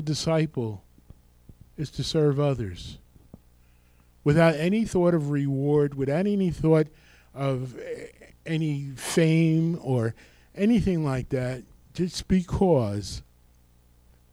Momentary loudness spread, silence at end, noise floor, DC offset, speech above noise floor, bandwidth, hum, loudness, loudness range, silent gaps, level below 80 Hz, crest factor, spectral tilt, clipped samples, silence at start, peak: 16 LU; 1.1 s; -58 dBFS; under 0.1%; 34 dB; 14 kHz; 60 Hz at -55 dBFS; -25 LUFS; 5 LU; none; -48 dBFS; 18 dB; -7 dB/octave; under 0.1%; 0 s; -8 dBFS